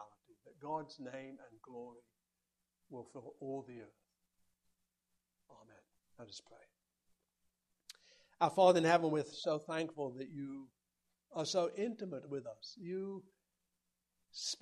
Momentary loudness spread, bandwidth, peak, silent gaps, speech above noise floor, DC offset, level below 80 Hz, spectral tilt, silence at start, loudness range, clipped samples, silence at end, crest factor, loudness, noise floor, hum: 24 LU; 12.5 kHz; -16 dBFS; none; 50 dB; under 0.1%; -86 dBFS; -4.5 dB/octave; 0 s; 19 LU; under 0.1%; 0.05 s; 26 dB; -37 LUFS; -88 dBFS; none